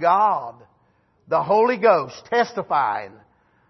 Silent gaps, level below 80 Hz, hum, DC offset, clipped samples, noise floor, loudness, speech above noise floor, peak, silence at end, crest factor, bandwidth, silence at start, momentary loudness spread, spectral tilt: none; -70 dBFS; none; under 0.1%; under 0.1%; -62 dBFS; -20 LUFS; 43 dB; -2 dBFS; 0.6 s; 18 dB; 6.2 kHz; 0 s; 12 LU; -5.5 dB/octave